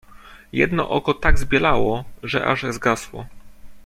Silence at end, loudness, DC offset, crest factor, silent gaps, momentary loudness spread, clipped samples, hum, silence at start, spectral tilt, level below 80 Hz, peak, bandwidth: 0.05 s; -21 LUFS; under 0.1%; 18 dB; none; 10 LU; under 0.1%; none; 0.15 s; -5.5 dB/octave; -28 dBFS; -2 dBFS; 14.5 kHz